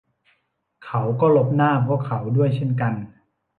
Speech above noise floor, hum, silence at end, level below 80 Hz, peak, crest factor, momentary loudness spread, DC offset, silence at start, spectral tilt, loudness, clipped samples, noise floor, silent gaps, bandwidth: 49 dB; none; 0.5 s; -60 dBFS; -6 dBFS; 16 dB; 10 LU; under 0.1%; 0.8 s; -10.5 dB/octave; -21 LUFS; under 0.1%; -69 dBFS; none; 4.3 kHz